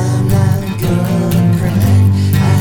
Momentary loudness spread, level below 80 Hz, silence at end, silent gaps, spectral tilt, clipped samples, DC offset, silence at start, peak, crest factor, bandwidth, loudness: 4 LU; -32 dBFS; 0 s; none; -7 dB/octave; under 0.1%; under 0.1%; 0 s; -2 dBFS; 10 dB; 19 kHz; -13 LUFS